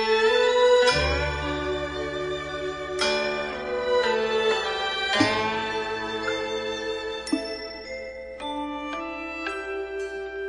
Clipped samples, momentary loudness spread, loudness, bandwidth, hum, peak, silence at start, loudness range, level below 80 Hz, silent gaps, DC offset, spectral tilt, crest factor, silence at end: under 0.1%; 12 LU; -25 LUFS; 11.5 kHz; none; -6 dBFS; 0 s; 8 LU; -44 dBFS; none; under 0.1%; -4 dB/octave; 20 dB; 0 s